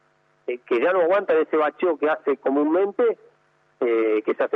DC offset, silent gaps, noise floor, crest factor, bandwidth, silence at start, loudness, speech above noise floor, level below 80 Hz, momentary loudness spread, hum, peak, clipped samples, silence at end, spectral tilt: under 0.1%; none; -63 dBFS; 12 dB; 4.1 kHz; 0.5 s; -22 LUFS; 42 dB; -82 dBFS; 9 LU; none; -10 dBFS; under 0.1%; 0 s; -7 dB/octave